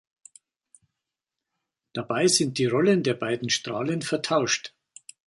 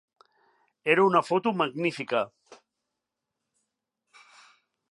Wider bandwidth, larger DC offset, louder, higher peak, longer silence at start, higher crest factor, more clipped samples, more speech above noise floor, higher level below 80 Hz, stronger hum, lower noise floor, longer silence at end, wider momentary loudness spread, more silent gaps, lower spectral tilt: about the same, 11.5 kHz vs 11.5 kHz; neither; about the same, -24 LUFS vs -26 LUFS; about the same, -6 dBFS vs -6 dBFS; first, 1.95 s vs 0.85 s; about the same, 20 dB vs 24 dB; neither; about the same, 62 dB vs 60 dB; first, -68 dBFS vs -84 dBFS; neither; about the same, -87 dBFS vs -85 dBFS; second, 0.6 s vs 2.65 s; about the same, 9 LU vs 10 LU; neither; second, -3.5 dB/octave vs -6 dB/octave